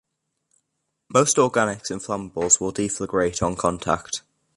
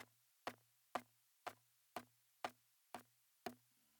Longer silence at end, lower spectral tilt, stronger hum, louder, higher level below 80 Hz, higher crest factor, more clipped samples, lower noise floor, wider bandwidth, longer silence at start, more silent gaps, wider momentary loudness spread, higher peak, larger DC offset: about the same, 0.35 s vs 0.4 s; about the same, -3.5 dB/octave vs -3 dB/octave; neither; first, -22 LUFS vs -55 LUFS; first, -50 dBFS vs under -90 dBFS; second, 22 dB vs 30 dB; neither; first, -77 dBFS vs -68 dBFS; second, 11.5 kHz vs 19 kHz; first, 1.1 s vs 0 s; neither; about the same, 11 LU vs 12 LU; first, -2 dBFS vs -26 dBFS; neither